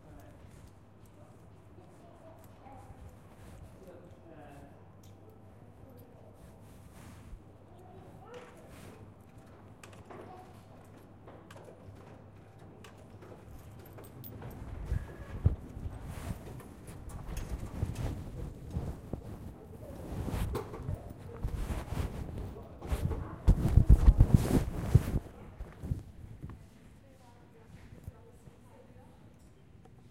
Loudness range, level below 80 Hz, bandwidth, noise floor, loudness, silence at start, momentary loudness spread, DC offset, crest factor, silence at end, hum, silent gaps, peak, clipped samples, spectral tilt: 25 LU; -38 dBFS; 16 kHz; -57 dBFS; -34 LUFS; 0.05 s; 25 LU; under 0.1%; 30 dB; 0.8 s; none; none; -6 dBFS; under 0.1%; -8 dB/octave